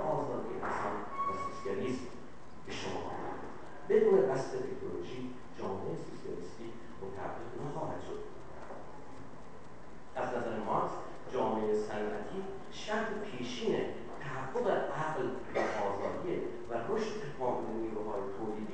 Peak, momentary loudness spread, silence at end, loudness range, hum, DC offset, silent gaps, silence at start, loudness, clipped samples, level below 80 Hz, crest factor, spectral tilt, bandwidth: -16 dBFS; 15 LU; 0 s; 9 LU; none; 0.7%; none; 0 s; -37 LUFS; under 0.1%; -62 dBFS; 22 dB; -6 dB/octave; 9.4 kHz